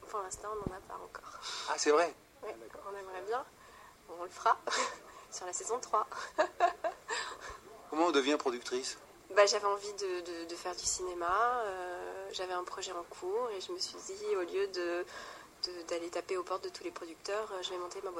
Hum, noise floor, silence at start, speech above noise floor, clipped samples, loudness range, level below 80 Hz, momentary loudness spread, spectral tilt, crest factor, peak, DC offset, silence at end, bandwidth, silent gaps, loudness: none; -57 dBFS; 0 s; 21 dB; under 0.1%; 5 LU; -66 dBFS; 16 LU; -2 dB/octave; 22 dB; -14 dBFS; under 0.1%; 0 s; 16 kHz; none; -35 LUFS